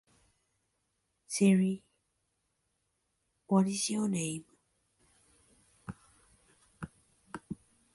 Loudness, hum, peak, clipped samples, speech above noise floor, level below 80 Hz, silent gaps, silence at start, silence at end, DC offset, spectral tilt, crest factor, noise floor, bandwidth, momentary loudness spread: -31 LUFS; none; -14 dBFS; under 0.1%; 51 dB; -70 dBFS; none; 1.3 s; 0.4 s; under 0.1%; -5.5 dB/octave; 22 dB; -80 dBFS; 11.5 kHz; 23 LU